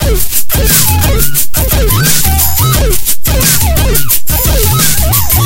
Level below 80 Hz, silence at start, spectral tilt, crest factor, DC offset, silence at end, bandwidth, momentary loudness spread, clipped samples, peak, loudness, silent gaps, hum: -14 dBFS; 0 s; -3 dB/octave; 8 dB; under 0.1%; 0 s; over 20 kHz; 4 LU; 0.4%; 0 dBFS; -9 LUFS; none; none